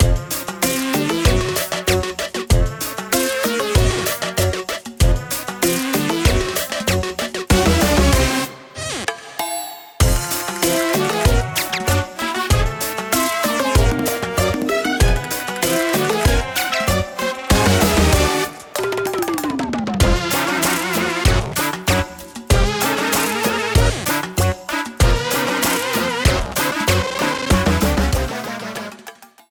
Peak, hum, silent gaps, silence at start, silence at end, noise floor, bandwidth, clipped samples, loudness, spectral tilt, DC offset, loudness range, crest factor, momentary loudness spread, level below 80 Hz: -4 dBFS; none; none; 0 s; 0.25 s; -41 dBFS; over 20 kHz; under 0.1%; -18 LUFS; -4 dB/octave; under 0.1%; 2 LU; 14 dB; 8 LU; -26 dBFS